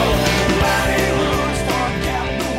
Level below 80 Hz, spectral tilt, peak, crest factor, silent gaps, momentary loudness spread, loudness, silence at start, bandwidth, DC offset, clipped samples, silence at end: -28 dBFS; -4.5 dB/octave; -6 dBFS; 12 dB; none; 5 LU; -18 LUFS; 0 s; 16.5 kHz; under 0.1%; under 0.1%; 0 s